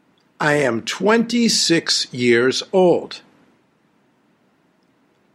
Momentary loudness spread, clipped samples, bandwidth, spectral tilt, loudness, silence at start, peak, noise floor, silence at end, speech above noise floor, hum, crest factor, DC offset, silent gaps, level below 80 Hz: 7 LU; under 0.1%; 16 kHz; -3.5 dB/octave; -17 LUFS; 0.4 s; -2 dBFS; -60 dBFS; 2.15 s; 43 dB; none; 18 dB; under 0.1%; none; -66 dBFS